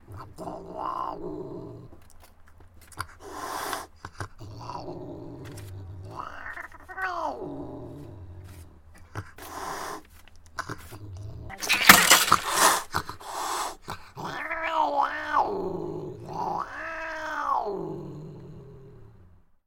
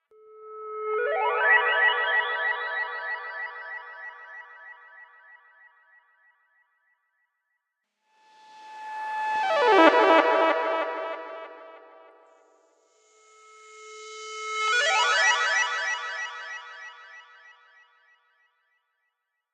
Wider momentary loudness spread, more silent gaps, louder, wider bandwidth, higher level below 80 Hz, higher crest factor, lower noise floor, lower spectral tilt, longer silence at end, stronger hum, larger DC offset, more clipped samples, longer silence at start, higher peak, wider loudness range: about the same, 22 LU vs 24 LU; neither; about the same, -25 LUFS vs -23 LUFS; first, 17 kHz vs 10.5 kHz; first, -52 dBFS vs under -90 dBFS; about the same, 30 dB vs 28 dB; second, -55 dBFS vs -80 dBFS; first, -1.5 dB/octave vs 0 dB/octave; second, 0.45 s vs 2.35 s; neither; neither; neither; second, 0.1 s vs 0.35 s; about the same, 0 dBFS vs 0 dBFS; about the same, 18 LU vs 20 LU